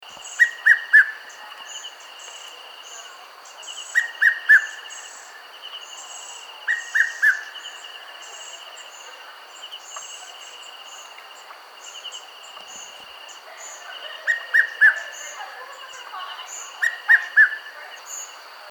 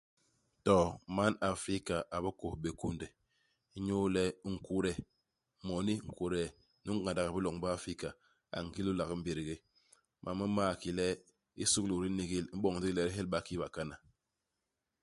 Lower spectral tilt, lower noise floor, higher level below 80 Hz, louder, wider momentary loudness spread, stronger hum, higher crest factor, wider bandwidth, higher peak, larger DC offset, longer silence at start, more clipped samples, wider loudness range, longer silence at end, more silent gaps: second, 4 dB/octave vs -5 dB/octave; second, -43 dBFS vs -88 dBFS; second, -86 dBFS vs -56 dBFS; first, -18 LUFS vs -36 LUFS; first, 24 LU vs 12 LU; neither; about the same, 22 dB vs 22 dB; first, over 20 kHz vs 11.5 kHz; first, -2 dBFS vs -14 dBFS; neither; second, 0.1 s vs 0.65 s; neither; first, 17 LU vs 3 LU; second, 0 s vs 1.05 s; neither